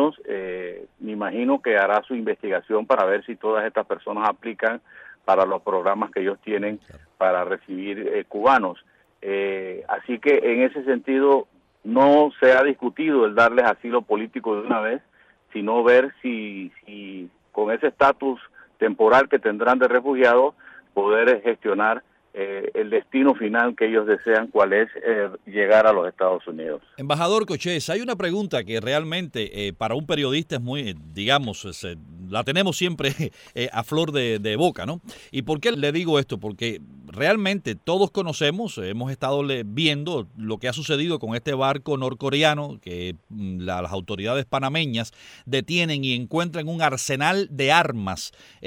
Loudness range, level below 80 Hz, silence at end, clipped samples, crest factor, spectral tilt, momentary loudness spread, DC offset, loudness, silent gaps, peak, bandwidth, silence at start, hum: 6 LU; -60 dBFS; 0 s; under 0.1%; 20 dB; -5 dB/octave; 14 LU; under 0.1%; -22 LUFS; none; -2 dBFS; 16 kHz; 0 s; none